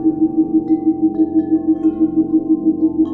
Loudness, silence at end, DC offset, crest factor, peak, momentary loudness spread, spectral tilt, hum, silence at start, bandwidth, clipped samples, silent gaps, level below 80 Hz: -16 LUFS; 0 s; under 0.1%; 10 dB; -4 dBFS; 1 LU; -12 dB/octave; none; 0 s; 1.8 kHz; under 0.1%; none; -50 dBFS